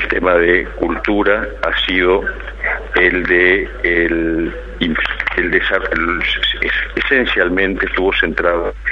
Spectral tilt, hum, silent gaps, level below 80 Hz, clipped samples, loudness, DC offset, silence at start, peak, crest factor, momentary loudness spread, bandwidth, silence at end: -6.5 dB/octave; none; none; -30 dBFS; under 0.1%; -15 LUFS; under 0.1%; 0 s; 0 dBFS; 16 dB; 7 LU; 7 kHz; 0 s